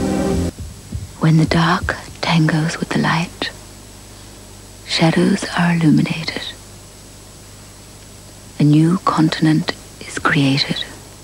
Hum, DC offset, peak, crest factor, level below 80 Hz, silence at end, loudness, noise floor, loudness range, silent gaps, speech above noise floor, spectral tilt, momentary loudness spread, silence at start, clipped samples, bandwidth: 50 Hz at -40 dBFS; under 0.1%; 0 dBFS; 18 dB; -38 dBFS; 0 s; -17 LUFS; -39 dBFS; 3 LU; none; 23 dB; -5.5 dB/octave; 24 LU; 0 s; under 0.1%; 13.5 kHz